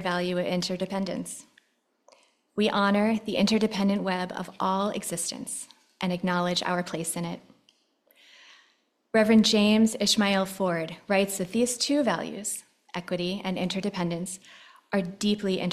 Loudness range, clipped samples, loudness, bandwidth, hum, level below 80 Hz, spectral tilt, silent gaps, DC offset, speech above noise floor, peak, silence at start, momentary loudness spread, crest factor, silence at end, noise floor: 7 LU; under 0.1%; -26 LUFS; 14 kHz; none; -64 dBFS; -4.5 dB/octave; none; under 0.1%; 42 dB; -8 dBFS; 0 s; 13 LU; 20 dB; 0 s; -68 dBFS